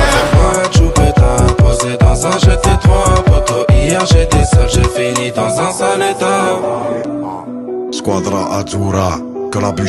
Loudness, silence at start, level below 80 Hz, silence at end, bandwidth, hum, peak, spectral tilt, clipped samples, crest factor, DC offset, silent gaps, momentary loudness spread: -12 LUFS; 0 s; -18 dBFS; 0 s; 12.5 kHz; none; 0 dBFS; -5.5 dB/octave; under 0.1%; 12 dB; under 0.1%; none; 9 LU